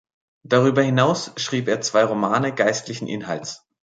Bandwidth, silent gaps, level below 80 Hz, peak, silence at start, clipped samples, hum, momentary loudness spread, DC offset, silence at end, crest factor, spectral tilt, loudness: 9.2 kHz; none; -64 dBFS; -4 dBFS; 0.5 s; under 0.1%; none; 11 LU; under 0.1%; 0.4 s; 18 dB; -5 dB/octave; -21 LUFS